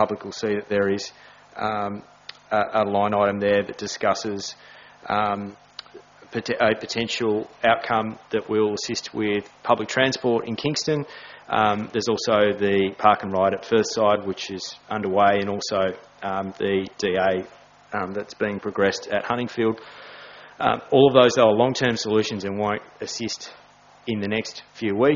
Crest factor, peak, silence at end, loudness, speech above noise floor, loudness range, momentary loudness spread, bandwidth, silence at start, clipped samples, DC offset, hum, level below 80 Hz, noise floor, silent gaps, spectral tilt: 22 dB; -2 dBFS; 0 s; -23 LUFS; 25 dB; 6 LU; 14 LU; 7.4 kHz; 0 s; under 0.1%; under 0.1%; none; -60 dBFS; -47 dBFS; none; -3.5 dB/octave